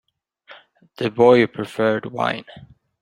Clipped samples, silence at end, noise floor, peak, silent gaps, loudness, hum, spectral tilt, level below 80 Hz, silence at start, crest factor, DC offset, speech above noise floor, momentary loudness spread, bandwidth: under 0.1%; 0.45 s; -50 dBFS; -2 dBFS; none; -19 LUFS; none; -6.5 dB/octave; -62 dBFS; 0.5 s; 20 dB; under 0.1%; 31 dB; 13 LU; 10.5 kHz